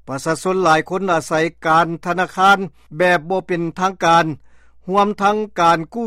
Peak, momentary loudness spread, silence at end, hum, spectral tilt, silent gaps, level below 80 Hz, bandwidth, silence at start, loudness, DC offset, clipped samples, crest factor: -2 dBFS; 7 LU; 0 s; none; -5 dB/octave; none; -54 dBFS; 15.5 kHz; 0.05 s; -17 LUFS; under 0.1%; under 0.1%; 14 dB